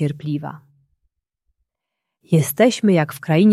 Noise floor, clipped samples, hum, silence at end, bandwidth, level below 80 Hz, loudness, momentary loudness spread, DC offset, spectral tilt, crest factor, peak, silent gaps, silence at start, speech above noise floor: -81 dBFS; under 0.1%; none; 0 s; 15 kHz; -62 dBFS; -18 LUFS; 12 LU; under 0.1%; -6.5 dB/octave; 18 dB; -2 dBFS; none; 0 s; 64 dB